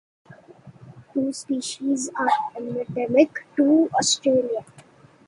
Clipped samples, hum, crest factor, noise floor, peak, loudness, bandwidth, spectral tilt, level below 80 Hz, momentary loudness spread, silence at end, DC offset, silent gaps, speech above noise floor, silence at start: under 0.1%; none; 20 dB; -51 dBFS; -4 dBFS; -22 LUFS; 11.5 kHz; -3.5 dB/octave; -66 dBFS; 11 LU; 0.65 s; under 0.1%; none; 29 dB; 0.3 s